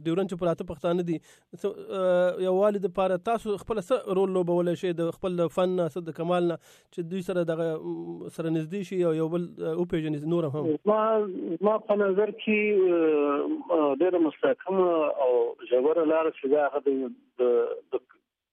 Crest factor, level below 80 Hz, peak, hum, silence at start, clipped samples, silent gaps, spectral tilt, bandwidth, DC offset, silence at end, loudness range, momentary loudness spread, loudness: 14 dB; -64 dBFS; -12 dBFS; none; 0 s; under 0.1%; none; -7.5 dB/octave; 12.5 kHz; under 0.1%; 0.55 s; 5 LU; 9 LU; -27 LUFS